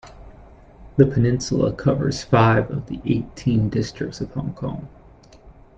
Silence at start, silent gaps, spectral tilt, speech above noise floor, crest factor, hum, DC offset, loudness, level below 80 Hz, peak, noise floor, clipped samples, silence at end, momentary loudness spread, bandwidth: 0.05 s; none; -7 dB/octave; 27 dB; 20 dB; none; under 0.1%; -21 LUFS; -42 dBFS; -2 dBFS; -47 dBFS; under 0.1%; 0.25 s; 12 LU; 8.2 kHz